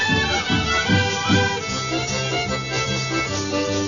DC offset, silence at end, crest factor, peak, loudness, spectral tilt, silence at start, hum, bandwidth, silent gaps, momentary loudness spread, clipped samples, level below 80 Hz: 0.2%; 0 s; 14 dB; -6 dBFS; -21 LUFS; -4 dB/octave; 0 s; none; 7.4 kHz; none; 5 LU; under 0.1%; -40 dBFS